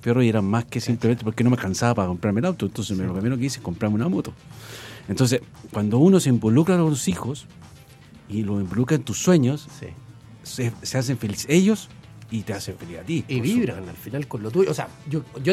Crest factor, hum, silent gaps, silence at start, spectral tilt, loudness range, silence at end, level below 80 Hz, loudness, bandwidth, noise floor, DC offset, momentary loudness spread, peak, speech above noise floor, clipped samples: 18 dB; none; none; 0 s; -6 dB/octave; 5 LU; 0 s; -54 dBFS; -23 LUFS; 15.5 kHz; -47 dBFS; under 0.1%; 16 LU; -4 dBFS; 25 dB; under 0.1%